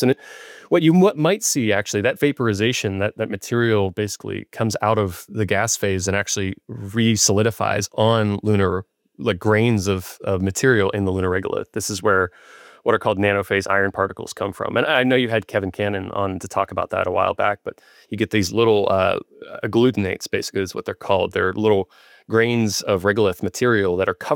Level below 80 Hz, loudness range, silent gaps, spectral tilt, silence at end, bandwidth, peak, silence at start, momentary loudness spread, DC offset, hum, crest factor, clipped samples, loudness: -60 dBFS; 3 LU; none; -4.5 dB/octave; 0 s; 17 kHz; -4 dBFS; 0 s; 9 LU; under 0.1%; none; 16 dB; under 0.1%; -20 LUFS